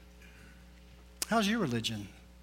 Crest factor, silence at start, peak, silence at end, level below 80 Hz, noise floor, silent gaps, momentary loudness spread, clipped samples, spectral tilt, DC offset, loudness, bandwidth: 20 dB; 0 s; -16 dBFS; 0 s; -56 dBFS; -55 dBFS; none; 25 LU; under 0.1%; -4 dB/octave; under 0.1%; -32 LUFS; 16.5 kHz